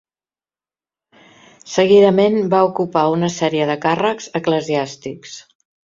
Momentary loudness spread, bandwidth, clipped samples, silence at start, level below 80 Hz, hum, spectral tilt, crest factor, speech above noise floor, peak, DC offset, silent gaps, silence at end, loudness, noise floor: 19 LU; 7.6 kHz; under 0.1%; 1.65 s; -60 dBFS; none; -5.5 dB/octave; 16 dB; over 74 dB; -2 dBFS; under 0.1%; none; 0.45 s; -16 LUFS; under -90 dBFS